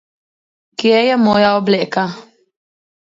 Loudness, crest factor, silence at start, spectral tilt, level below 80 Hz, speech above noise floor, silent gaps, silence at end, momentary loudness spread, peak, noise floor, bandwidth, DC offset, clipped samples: -14 LUFS; 16 dB; 0.8 s; -6 dB/octave; -58 dBFS; over 77 dB; none; 0.85 s; 13 LU; 0 dBFS; under -90 dBFS; 7.6 kHz; under 0.1%; under 0.1%